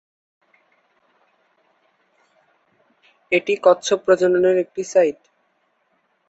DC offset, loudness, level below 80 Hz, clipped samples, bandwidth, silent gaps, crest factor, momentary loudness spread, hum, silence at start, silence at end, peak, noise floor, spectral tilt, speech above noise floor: under 0.1%; -18 LUFS; -70 dBFS; under 0.1%; 8.2 kHz; none; 20 dB; 5 LU; none; 3.3 s; 1.15 s; -2 dBFS; -66 dBFS; -4 dB/octave; 49 dB